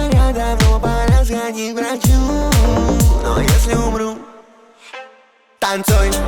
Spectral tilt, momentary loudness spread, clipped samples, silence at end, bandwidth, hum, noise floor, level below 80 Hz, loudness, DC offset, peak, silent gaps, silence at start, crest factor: -5.5 dB/octave; 10 LU; under 0.1%; 0 s; 19 kHz; none; -50 dBFS; -18 dBFS; -16 LUFS; under 0.1%; -4 dBFS; none; 0 s; 12 dB